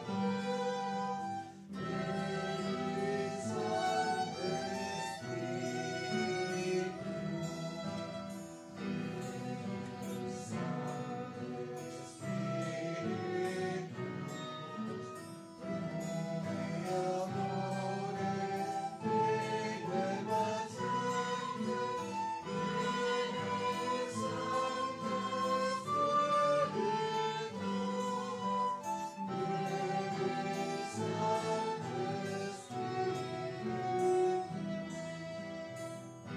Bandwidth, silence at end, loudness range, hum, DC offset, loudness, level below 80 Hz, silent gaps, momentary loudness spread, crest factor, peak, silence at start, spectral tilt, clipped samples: 15.5 kHz; 0 s; 7 LU; none; under 0.1%; -37 LUFS; -70 dBFS; none; 9 LU; 16 dB; -22 dBFS; 0 s; -5.5 dB/octave; under 0.1%